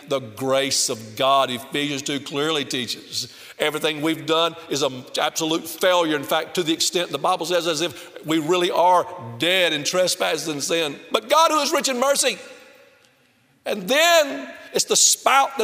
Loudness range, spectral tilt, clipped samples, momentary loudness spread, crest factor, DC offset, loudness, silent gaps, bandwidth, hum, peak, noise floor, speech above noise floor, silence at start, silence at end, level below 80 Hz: 4 LU; -2 dB/octave; under 0.1%; 10 LU; 22 dB; under 0.1%; -20 LUFS; none; 16 kHz; none; 0 dBFS; -60 dBFS; 38 dB; 0 s; 0 s; -70 dBFS